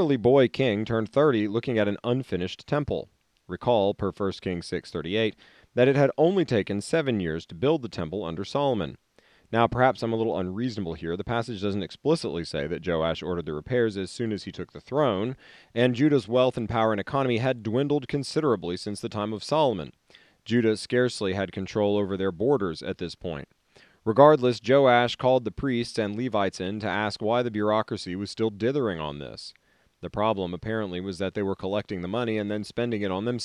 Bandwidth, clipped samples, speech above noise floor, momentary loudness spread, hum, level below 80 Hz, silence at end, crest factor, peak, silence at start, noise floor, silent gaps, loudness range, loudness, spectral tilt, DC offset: 11.5 kHz; under 0.1%; 33 dB; 11 LU; none; -56 dBFS; 0 s; 24 dB; -2 dBFS; 0 s; -59 dBFS; none; 6 LU; -26 LUFS; -6.5 dB/octave; under 0.1%